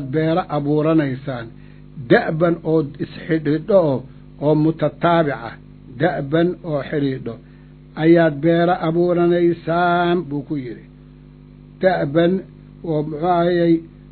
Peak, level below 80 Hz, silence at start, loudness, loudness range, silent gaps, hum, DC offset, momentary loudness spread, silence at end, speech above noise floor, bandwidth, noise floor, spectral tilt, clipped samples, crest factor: 0 dBFS; -48 dBFS; 0 s; -18 LUFS; 4 LU; none; 50 Hz at -40 dBFS; under 0.1%; 13 LU; 0.25 s; 25 dB; 4.5 kHz; -42 dBFS; -11.5 dB/octave; under 0.1%; 18 dB